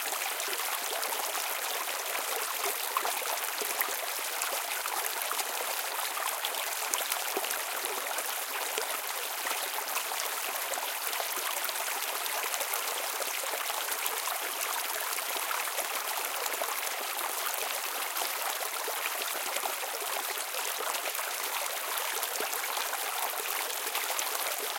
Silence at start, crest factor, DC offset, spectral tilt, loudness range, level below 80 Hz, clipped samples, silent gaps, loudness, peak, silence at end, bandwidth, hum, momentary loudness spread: 0 s; 28 dB; under 0.1%; 3 dB/octave; 1 LU; under -90 dBFS; under 0.1%; none; -31 LUFS; -6 dBFS; 0 s; 17 kHz; none; 2 LU